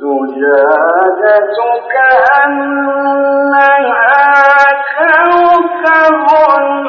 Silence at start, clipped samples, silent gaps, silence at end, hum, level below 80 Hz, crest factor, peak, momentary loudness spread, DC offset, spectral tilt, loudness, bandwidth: 0 s; under 0.1%; none; 0 s; none; -56 dBFS; 8 dB; 0 dBFS; 7 LU; under 0.1%; -4.5 dB/octave; -8 LUFS; 6.8 kHz